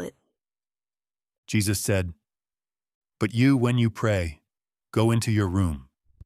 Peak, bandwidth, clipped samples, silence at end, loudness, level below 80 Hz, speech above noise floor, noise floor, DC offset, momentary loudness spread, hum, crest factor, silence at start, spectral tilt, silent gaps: -8 dBFS; 15.5 kHz; under 0.1%; 0.45 s; -25 LUFS; -48 dBFS; over 67 dB; under -90 dBFS; under 0.1%; 12 LU; none; 18 dB; 0 s; -6 dB/octave; 1.38-1.43 s, 2.94-3.01 s